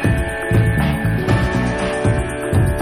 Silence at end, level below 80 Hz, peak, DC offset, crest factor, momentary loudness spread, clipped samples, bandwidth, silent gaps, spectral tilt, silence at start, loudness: 0 s; -26 dBFS; -2 dBFS; under 0.1%; 14 dB; 3 LU; under 0.1%; 15.5 kHz; none; -7 dB/octave; 0 s; -18 LUFS